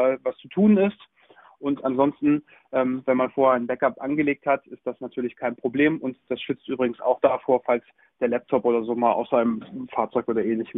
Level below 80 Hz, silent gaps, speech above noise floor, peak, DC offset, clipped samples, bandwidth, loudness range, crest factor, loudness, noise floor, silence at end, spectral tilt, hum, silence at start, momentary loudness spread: -64 dBFS; none; 31 dB; -6 dBFS; under 0.1%; under 0.1%; 3.9 kHz; 2 LU; 18 dB; -24 LUFS; -54 dBFS; 0 s; -10.5 dB/octave; none; 0 s; 10 LU